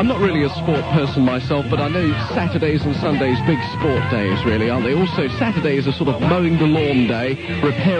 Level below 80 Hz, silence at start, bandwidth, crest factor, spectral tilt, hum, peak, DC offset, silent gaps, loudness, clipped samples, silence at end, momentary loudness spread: -44 dBFS; 0 s; 9.4 kHz; 14 dB; -8 dB/octave; none; -4 dBFS; under 0.1%; none; -18 LUFS; under 0.1%; 0 s; 4 LU